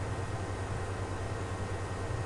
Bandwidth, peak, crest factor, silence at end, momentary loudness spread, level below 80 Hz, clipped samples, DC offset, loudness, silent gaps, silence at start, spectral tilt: 11.5 kHz; -24 dBFS; 12 dB; 0 s; 0 LU; -46 dBFS; under 0.1%; under 0.1%; -37 LUFS; none; 0 s; -6 dB/octave